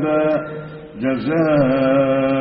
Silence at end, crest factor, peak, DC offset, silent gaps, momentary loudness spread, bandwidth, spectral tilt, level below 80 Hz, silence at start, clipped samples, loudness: 0 s; 12 dB; -6 dBFS; under 0.1%; none; 15 LU; 5.8 kHz; -6.5 dB/octave; -50 dBFS; 0 s; under 0.1%; -17 LUFS